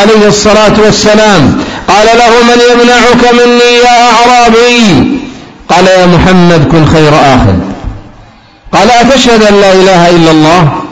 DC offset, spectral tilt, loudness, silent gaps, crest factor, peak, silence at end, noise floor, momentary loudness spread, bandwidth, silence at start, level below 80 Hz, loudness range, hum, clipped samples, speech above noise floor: under 0.1%; -5 dB/octave; -3 LUFS; none; 4 dB; 0 dBFS; 0 s; -34 dBFS; 6 LU; 11 kHz; 0 s; -24 dBFS; 3 LU; none; 7%; 31 dB